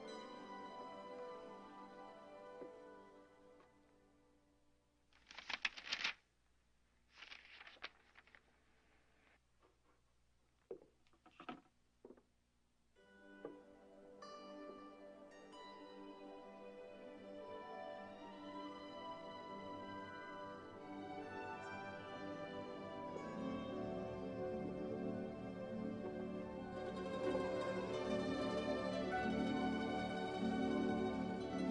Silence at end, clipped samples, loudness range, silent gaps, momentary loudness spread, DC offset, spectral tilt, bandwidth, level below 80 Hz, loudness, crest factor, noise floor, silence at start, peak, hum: 0 s; under 0.1%; 20 LU; none; 18 LU; under 0.1%; -5.5 dB/octave; 10 kHz; -70 dBFS; -46 LUFS; 24 dB; -78 dBFS; 0 s; -24 dBFS; none